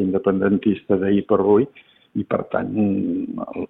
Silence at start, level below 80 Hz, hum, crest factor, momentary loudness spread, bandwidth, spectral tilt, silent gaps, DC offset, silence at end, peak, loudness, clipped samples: 0 s; -56 dBFS; none; 16 dB; 10 LU; 4 kHz; -11.5 dB/octave; none; under 0.1%; 0.05 s; -4 dBFS; -20 LUFS; under 0.1%